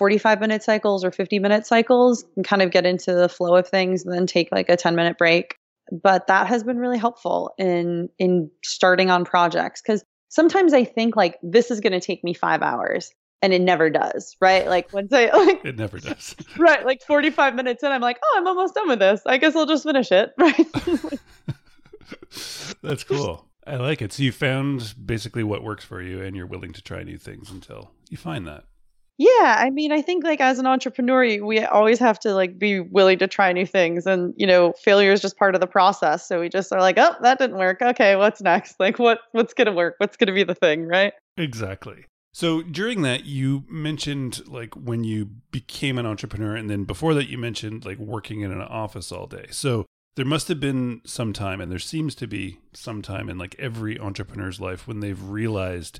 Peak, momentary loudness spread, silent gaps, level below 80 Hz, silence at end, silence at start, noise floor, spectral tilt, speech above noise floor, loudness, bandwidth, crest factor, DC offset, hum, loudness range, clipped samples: -4 dBFS; 16 LU; 5.57-5.76 s, 10.05-10.27 s, 13.15-13.39 s, 41.20-41.36 s, 42.09-42.31 s, 49.87-50.11 s; -54 dBFS; 0 s; 0 s; -49 dBFS; -5 dB/octave; 28 dB; -20 LUFS; 14 kHz; 16 dB; under 0.1%; none; 10 LU; under 0.1%